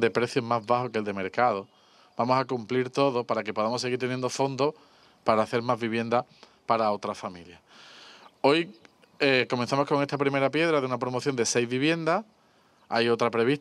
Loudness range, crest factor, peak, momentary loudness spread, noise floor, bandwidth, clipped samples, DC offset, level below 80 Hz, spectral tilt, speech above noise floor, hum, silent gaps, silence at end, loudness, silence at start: 3 LU; 20 dB; -6 dBFS; 8 LU; -62 dBFS; 12.5 kHz; under 0.1%; under 0.1%; -74 dBFS; -4.5 dB/octave; 35 dB; none; none; 0 s; -27 LUFS; 0 s